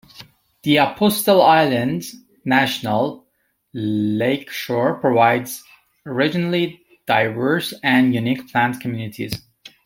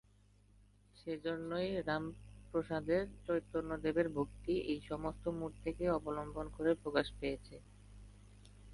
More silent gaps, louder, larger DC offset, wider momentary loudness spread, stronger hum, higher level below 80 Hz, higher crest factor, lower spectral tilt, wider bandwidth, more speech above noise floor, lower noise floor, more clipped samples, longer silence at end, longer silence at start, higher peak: neither; first, -19 LUFS vs -39 LUFS; neither; about the same, 13 LU vs 12 LU; neither; about the same, -58 dBFS vs -56 dBFS; about the same, 18 dB vs 22 dB; second, -5 dB/octave vs -7 dB/octave; first, 16.5 kHz vs 11.5 kHz; first, 48 dB vs 29 dB; about the same, -67 dBFS vs -67 dBFS; neither; first, 0.5 s vs 0 s; second, 0.2 s vs 0.95 s; first, -2 dBFS vs -18 dBFS